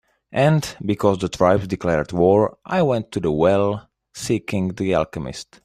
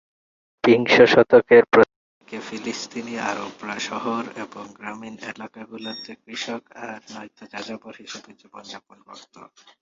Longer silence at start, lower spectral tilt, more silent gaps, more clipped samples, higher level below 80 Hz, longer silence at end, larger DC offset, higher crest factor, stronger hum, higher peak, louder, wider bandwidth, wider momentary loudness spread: second, 0.3 s vs 0.65 s; first, -6.5 dB/octave vs -4.5 dB/octave; second, none vs 1.96-2.21 s; neither; first, -48 dBFS vs -62 dBFS; second, 0.2 s vs 0.4 s; neither; about the same, 18 dB vs 20 dB; neither; about the same, -2 dBFS vs -2 dBFS; about the same, -20 LUFS vs -19 LUFS; first, 15 kHz vs 7.6 kHz; second, 11 LU vs 24 LU